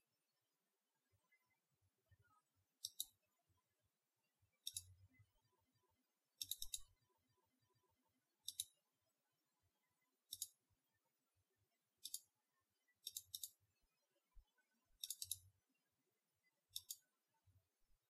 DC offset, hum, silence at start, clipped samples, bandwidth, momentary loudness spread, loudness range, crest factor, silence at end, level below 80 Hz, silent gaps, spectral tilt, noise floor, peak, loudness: under 0.1%; none; 2.1 s; under 0.1%; 15.5 kHz; 7 LU; 4 LU; 34 dB; 0.5 s; -82 dBFS; none; 1.5 dB/octave; under -90 dBFS; -28 dBFS; -53 LUFS